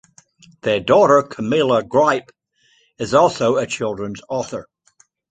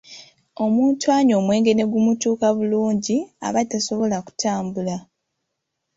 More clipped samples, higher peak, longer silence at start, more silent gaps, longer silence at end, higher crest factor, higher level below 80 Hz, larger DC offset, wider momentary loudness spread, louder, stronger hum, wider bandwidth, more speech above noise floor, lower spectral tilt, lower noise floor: neither; first, -2 dBFS vs -6 dBFS; first, 0.65 s vs 0.1 s; neither; second, 0.7 s vs 0.95 s; about the same, 18 dB vs 16 dB; first, -56 dBFS vs -62 dBFS; neither; first, 13 LU vs 8 LU; first, -17 LUFS vs -20 LUFS; neither; first, 9.2 kHz vs 8 kHz; second, 42 dB vs 58 dB; about the same, -5 dB/octave vs -5 dB/octave; second, -59 dBFS vs -78 dBFS